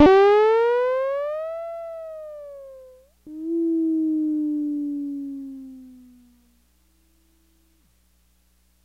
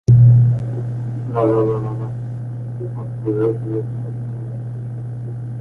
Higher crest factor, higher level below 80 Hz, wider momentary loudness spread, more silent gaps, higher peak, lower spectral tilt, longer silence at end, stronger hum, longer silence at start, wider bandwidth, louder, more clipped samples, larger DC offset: about the same, 20 dB vs 16 dB; second, -56 dBFS vs -42 dBFS; first, 23 LU vs 15 LU; neither; about the same, -4 dBFS vs -2 dBFS; second, -6.5 dB/octave vs -11 dB/octave; first, 2.9 s vs 0 s; neither; about the same, 0 s vs 0.1 s; first, 7.2 kHz vs 2.8 kHz; about the same, -22 LUFS vs -20 LUFS; neither; neither